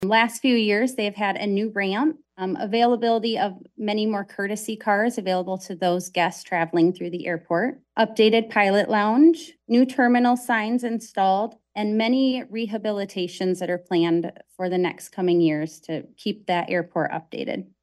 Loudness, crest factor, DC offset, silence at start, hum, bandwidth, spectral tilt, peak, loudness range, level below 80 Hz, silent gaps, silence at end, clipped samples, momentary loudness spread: -23 LUFS; 18 dB; under 0.1%; 0 s; none; 12.5 kHz; -5.5 dB/octave; -4 dBFS; 5 LU; -72 dBFS; none; 0.2 s; under 0.1%; 11 LU